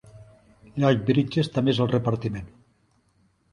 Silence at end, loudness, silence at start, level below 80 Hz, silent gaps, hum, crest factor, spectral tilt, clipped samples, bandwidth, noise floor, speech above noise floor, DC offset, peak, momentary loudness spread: 1.05 s; -24 LUFS; 0.15 s; -54 dBFS; none; none; 20 dB; -7.5 dB/octave; under 0.1%; 11 kHz; -65 dBFS; 42 dB; under 0.1%; -6 dBFS; 11 LU